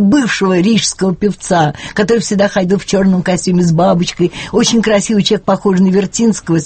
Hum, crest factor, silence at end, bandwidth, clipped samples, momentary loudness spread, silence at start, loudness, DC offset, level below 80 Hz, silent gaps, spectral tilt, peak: none; 12 dB; 0 s; 8.8 kHz; under 0.1%; 4 LU; 0 s; -12 LUFS; under 0.1%; -42 dBFS; none; -5 dB/octave; 0 dBFS